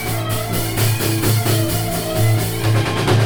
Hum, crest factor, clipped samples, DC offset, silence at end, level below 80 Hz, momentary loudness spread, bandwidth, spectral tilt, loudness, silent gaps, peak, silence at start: none; 14 dB; under 0.1%; under 0.1%; 0 s; -36 dBFS; 4 LU; over 20 kHz; -5 dB/octave; -18 LUFS; none; -4 dBFS; 0 s